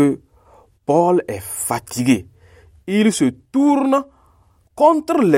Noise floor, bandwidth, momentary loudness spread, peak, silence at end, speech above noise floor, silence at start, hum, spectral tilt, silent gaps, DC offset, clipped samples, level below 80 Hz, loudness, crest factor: -55 dBFS; 16.5 kHz; 12 LU; -2 dBFS; 0 s; 39 dB; 0 s; none; -5.5 dB/octave; none; under 0.1%; under 0.1%; -54 dBFS; -18 LUFS; 16 dB